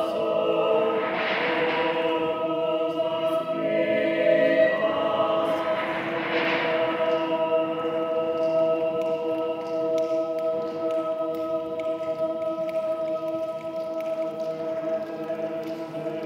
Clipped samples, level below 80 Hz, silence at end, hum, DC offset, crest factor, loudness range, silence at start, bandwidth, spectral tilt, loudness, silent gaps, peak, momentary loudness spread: under 0.1%; -74 dBFS; 0 s; none; under 0.1%; 16 dB; 6 LU; 0 s; 11 kHz; -6 dB/octave; -25 LUFS; none; -10 dBFS; 7 LU